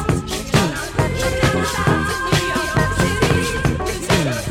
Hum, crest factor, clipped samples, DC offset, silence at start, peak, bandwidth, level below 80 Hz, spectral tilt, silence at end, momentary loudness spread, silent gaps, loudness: none; 18 dB; under 0.1%; under 0.1%; 0 s; 0 dBFS; 17 kHz; -30 dBFS; -4.5 dB/octave; 0 s; 3 LU; none; -18 LUFS